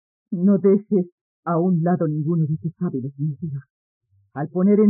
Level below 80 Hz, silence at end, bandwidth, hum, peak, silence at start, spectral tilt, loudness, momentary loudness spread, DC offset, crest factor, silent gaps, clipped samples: -72 dBFS; 0 s; 2.3 kHz; none; -6 dBFS; 0.3 s; -14.5 dB/octave; -22 LUFS; 14 LU; under 0.1%; 14 dB; 1.12-1.43 s, 3.70-4.01 s; under 0.1%